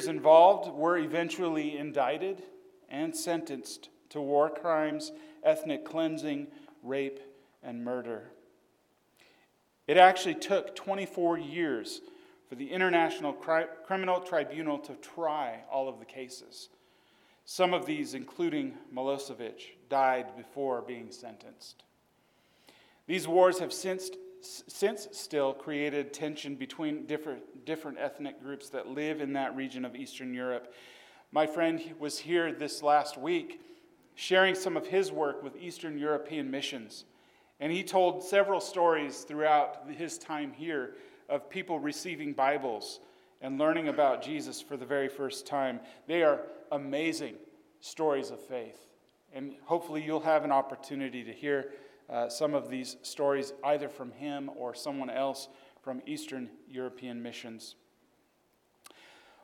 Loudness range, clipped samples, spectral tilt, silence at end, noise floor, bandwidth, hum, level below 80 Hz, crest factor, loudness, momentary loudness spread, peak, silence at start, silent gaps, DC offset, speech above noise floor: 8 LU; under 0.1%; -4 dB/octave; 1.7 s; -71 dBFS; 16.5 kHz; none; -86 dBFS; 26 dB; -31 LUFS; 16 LU; -6 dBFS; 0 s; none; under 0.1%; 40 dB